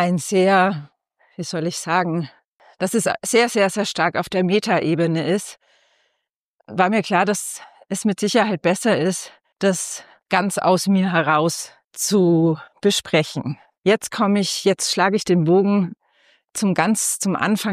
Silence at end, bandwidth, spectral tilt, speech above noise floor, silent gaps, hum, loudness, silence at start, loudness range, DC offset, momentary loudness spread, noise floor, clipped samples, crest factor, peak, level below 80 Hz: 0 s; 15.5 kHz; -4.5 dB/octave; 57 dB; 2.45-2.59 s, 6.30-6.59 s, 11.84-11.91 s, 13.78-13.82 s; none; -19 LUFS; 0 s; 3 LU; under 0.1%; 12 LU; -76 dBFS; under 0.1%; 16 dB; -4 dBFS; -66 dBFS